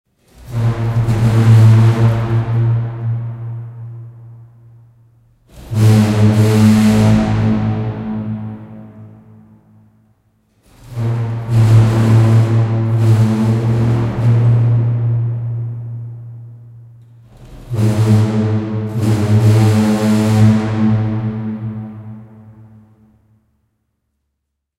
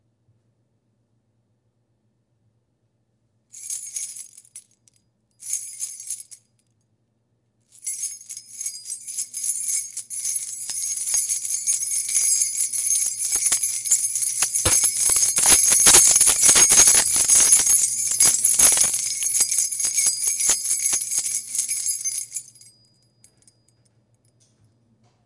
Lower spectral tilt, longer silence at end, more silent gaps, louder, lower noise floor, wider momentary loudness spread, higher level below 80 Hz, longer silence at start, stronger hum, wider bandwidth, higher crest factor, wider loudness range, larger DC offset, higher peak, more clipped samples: first, -8 dB/octave vs 1 dB/octave; second, 2.3 s vs 2.85 s; neither; about the same, -14 LUFS vs -16 LUFS; first, -74 dBFS vs -69 dBFS; about the same, 18 LU vs 19 LU; first, -38 dBFS vs -54 dBFS; second, 0.4 s vs 3.55 s; neither; about the same, 12 kHz vs 12 kHz; second, 14 dB vs 22 dB; second, 11 LU vs 21 LU; neither; about the same, 0 dBFS vs 0 dBFS; neither